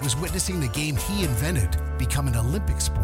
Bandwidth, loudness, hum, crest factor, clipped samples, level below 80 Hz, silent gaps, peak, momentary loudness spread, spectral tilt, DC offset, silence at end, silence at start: 16.5 kHz; -25 LUFS; none; 14 dB; under 0.1%; -28 dBFS; none; -10 dBFS; 2 LU; -4.5 dB/octave; under 0.1%; 0 s; 0 s